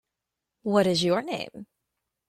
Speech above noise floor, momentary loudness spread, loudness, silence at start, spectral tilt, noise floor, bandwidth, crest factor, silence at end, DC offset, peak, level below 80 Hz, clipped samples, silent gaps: 61 dB; 14 LU; -25 LUFS; 0.65 s; -5 dB/octave; -86 dBFS; 14 kHz; 20 dB; 0.65 s; under 0.1%; -8 dBFS; -66 dBFS; under 0.1%; none